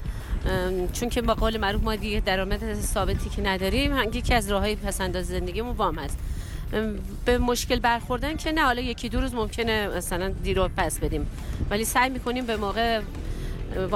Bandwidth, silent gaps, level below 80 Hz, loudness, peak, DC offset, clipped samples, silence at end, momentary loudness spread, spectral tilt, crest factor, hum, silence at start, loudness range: 16.5 kHz; none; -32 dBFS; -26 LUFS; -10 dBFS; under 0.1%; under 0.1%; 0 s; 8 LU; -4.5 dB/octave; 16 dB; none; 0 s; 2 LU